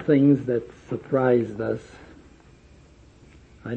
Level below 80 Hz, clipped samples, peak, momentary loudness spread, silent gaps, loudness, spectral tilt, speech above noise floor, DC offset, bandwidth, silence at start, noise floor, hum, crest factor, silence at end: -56 dBFS; under 0.1%; -6 dBFS; 16 LU; none; -23 LUFS; -9.5 dB/octave; 29 dB; under 0.1%; 7.8 kHz; 0 s; -51 dBFS; none; 18 dB; 0 s